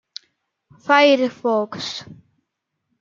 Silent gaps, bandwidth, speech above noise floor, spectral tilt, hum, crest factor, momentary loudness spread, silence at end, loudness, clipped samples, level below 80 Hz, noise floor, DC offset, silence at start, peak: none; 7.6 kHz; 59 dB; -4 dB/octave; none; 20 dB; 23 LU; 0.9 s; -18 LUFS; under 0.1%; -72 dBFS; -77 dBFS; under 0.1%; 0.85 s; -2 dBFS